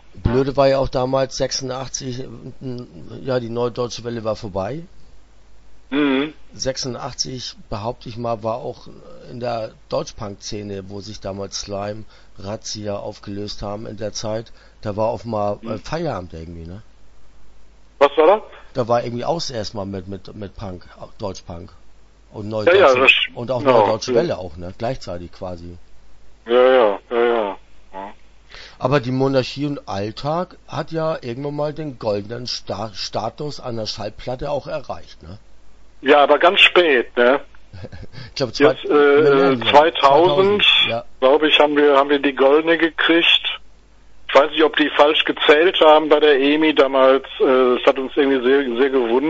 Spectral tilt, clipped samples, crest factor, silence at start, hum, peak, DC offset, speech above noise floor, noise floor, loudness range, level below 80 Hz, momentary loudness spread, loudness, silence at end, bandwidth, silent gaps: -4.5 dB/octave; under 0.1%; 18 dB; 0.05 s; none; 0 dBFS; under 0.1%; 26 dB; -44 dBFS; 14 LU; -44 dBFS; 19 LU; -17 LUFS; 0 s; 8 kHz; none